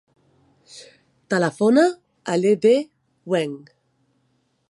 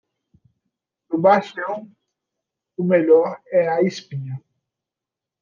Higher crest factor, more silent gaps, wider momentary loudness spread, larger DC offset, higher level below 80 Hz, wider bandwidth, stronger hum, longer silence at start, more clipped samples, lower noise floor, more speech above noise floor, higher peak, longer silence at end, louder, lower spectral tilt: about the same, 18 dB vs 18 dB; neither; first, 24 LU vs 17 LU; neither; about the same, -74 dBFS vs -74 dBFS; first, 11.5 kHz vs 7.2 kHz; neither; second, 0.75 s vs 1.1 s; neither; second, -67 dBFS vs -87 dBFS; second, 49 dB vs 68 dB; about the same, -4 dBFS vs -4 dBFS; about the same, 1.15 s vs 1.05 s; about the same, -20 LUFS vs -19 LUFS; second, -6 dB/octave vs -7.5 dB/octave